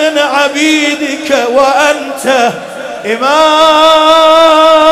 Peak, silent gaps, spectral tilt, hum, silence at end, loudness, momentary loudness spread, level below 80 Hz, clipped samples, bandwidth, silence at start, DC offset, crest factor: 0 dBFS; none; -2 dB/octave; none; 0 s; -7 LUFS; 10 LU; -48 dBFS; 0.3%; 16 kHz; 0 s; under 0.1%; 8 dB